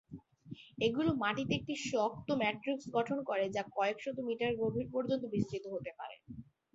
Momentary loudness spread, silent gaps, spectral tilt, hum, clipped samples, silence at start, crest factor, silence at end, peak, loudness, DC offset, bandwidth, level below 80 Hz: 18 LU; none; -4 dB/octave; none; under 0.1%; 0.1 s; 18 dB; 0.35 s; -18 dBFS; -36 LUFS; under 0.1%; 7.6 kHz; -66 dBFS